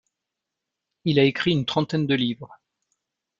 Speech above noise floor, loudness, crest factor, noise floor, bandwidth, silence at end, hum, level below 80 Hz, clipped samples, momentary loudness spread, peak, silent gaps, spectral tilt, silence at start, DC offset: 62 dB; -23 LUFS; 22 dB; -85 dBFS; 7.6 kHz; 0.85 s; none; -62 dBFS; under 0.1%; 9 LU; -4 dBFS; none; -7 dB/octave; 1.05 s; under 0.1%